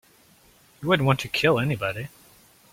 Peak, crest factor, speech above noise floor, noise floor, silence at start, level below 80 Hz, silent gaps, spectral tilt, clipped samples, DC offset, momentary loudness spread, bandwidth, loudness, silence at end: -4 dBFS; 22 dB; 34 dB; -57 dBFS; 0.8 s; -56 dBFS; none; -6 dB/octave; under 0.1%; under 0.1%; 13 LU; 16.5 kHz; -23 LUFS; 0.65 s